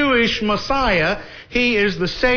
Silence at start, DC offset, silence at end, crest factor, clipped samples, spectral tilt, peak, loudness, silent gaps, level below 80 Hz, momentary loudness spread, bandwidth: 0 s; under 0.1%; 0 s; 14 dB; under 0.1%; -5 dB/octave; -4 dBFS; -18 LUFS; none; -34 dBFS; 6 LU; 5.4 kHz